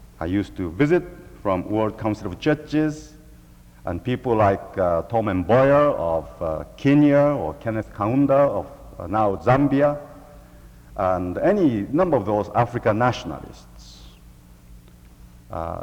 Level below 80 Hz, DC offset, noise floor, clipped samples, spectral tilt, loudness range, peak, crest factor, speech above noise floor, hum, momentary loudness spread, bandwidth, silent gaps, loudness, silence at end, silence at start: -46 dBFS; under 0.1%; -47 dBFS; under 0.1%; -8 dB/octave; 5 LU; -4 dBFS; 18 dB; 27 dB; none; 14 LU; 12.5 kHz; none; -21 LUFS; 0 s; 0 s